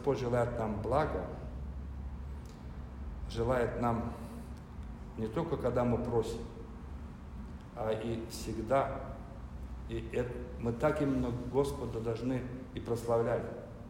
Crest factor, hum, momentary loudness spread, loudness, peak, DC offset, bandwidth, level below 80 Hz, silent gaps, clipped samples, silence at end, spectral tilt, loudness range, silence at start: 18 dB; none; 15 LU; -35 LUFS; -16 dBFS; under 0.1%; 16 kHz; -46 dBFS; none; under 0.1%; 0 s; -7.5 dB/octave; 4 LU; 0 s